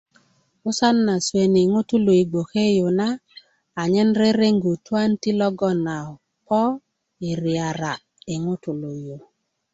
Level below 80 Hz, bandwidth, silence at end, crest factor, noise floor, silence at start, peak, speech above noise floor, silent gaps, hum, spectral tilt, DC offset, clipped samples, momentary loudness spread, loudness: -60 dBFS; 8.2 kHz; 0.55 s; 16 dB; -60 dBFS; 0.65 s; -6 dBFS; 40 dB; none; none; -6 dB/octave; under 0.1%; under 0.1%; 15 LU; -21 LUFS